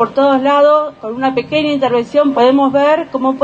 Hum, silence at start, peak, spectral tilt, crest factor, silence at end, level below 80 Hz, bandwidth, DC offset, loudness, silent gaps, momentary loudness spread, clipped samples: none; 0 s; 0 dBFS; -6 dB/octave; 12 dB; 0 s; -56 dBFS; 7.6 kHz; under 0.1%; -13 LUFS; none; 7 LU; under 0.1%